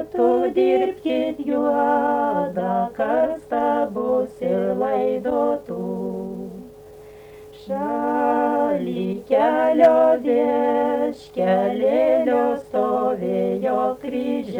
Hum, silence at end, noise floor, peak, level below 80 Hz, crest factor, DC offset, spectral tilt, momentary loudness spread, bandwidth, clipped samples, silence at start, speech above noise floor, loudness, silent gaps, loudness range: none; 0 s; -42 dBFS; -4 dBFS; -58 dBFS; 16 dB; under 0.1%; -7.5 dB/octave; 9 LU; 19.5 kHz; under 0.1%; 0 s; 22 dB; -21 LUFS; none; 6 LU